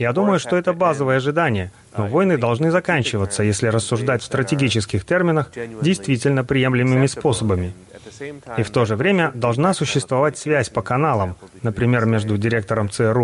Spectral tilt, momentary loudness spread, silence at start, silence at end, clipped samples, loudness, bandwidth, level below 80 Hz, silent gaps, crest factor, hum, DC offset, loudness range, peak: -6 dB/octave; 7 LU; 0 s; 0 s; under 0.1%; -19 LUFS; 11.5 kHz; -48 dBFS; none; 14 dB; none; under 0.1%; 1 LU; -4 dBFS